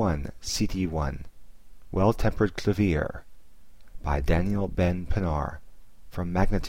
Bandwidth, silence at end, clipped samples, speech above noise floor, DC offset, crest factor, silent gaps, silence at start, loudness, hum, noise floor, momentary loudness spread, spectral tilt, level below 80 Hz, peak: 16 kHz; 0 s; under 0.1%; 28 dB; 0.8%; 18 dB; none; 0 s; -28 LUFS; none; -53 dBFS; 11 LU; -6.5 dB/octave; -34 dBFS; -8 dBFS